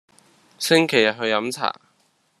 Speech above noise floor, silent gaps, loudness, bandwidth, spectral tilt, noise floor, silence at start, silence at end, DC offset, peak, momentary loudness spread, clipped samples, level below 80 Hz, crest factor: 44 dB; none; -20 LUFS; 13.5 kHz; -3.5 dB/octave; -64 dBFS; 0.6 s; 0.7 s; under 0.1%; -2 dBFS; 11 LU; under 0.1%; -68 dBFS; 22 dB